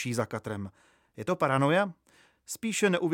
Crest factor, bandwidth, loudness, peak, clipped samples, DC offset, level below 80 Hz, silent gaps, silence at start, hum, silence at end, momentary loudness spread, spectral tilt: 18 dB; 17 kHz; -29 LUFS; -12 dBFS; under 0.1%; under 0.1%; -70 dBFS; none; 0 s; none; 0 s; 14 LU; -5 dB/octave